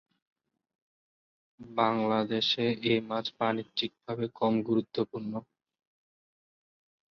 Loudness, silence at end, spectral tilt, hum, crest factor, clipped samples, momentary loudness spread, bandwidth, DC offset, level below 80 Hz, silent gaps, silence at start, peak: -30 LUFS; 1.65 s; -6.5 dB/octave; none; 22 dB; under 0.1%; 9 LU; 6.6 kHz; under 0.1%; -72 dBFS; none; 1.6 s; -10 dBFS